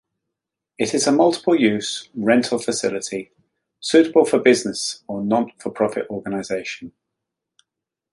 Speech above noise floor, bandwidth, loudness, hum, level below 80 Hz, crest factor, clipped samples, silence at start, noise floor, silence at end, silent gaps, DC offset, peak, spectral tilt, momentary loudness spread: 64 dB; 11.5 kHz; -20 LUFS; none; -64 dBFS; 18 dB; under 0.1%; 0.8 s; -83 dBFS; 1.25 s; none; under 0.1%; -2 dBFS; -4 dB/octave; 12 LU